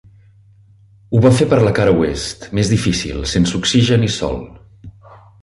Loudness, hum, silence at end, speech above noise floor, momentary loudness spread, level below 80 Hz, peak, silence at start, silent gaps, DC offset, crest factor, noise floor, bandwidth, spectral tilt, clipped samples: -15 LUFS; none; 0.5 s; 33 dB; 9 LU; -34 dBFS; -2 dBFS; 1.1 s; none; under 0.1%; 14 dB; -48 dBFS; 11.5 kHz; -5.5 dB/octave; under 0.1%